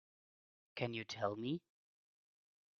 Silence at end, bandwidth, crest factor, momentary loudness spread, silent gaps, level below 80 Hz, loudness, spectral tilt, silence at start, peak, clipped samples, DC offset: 1.2 s; 6.8 kHz; 24 dB; 6 LU; none; -82 dBFS; -43 LUFS; -4.5 dB/octave; 0.75 s; -22 dBFS; under 0.1%; under 0.1%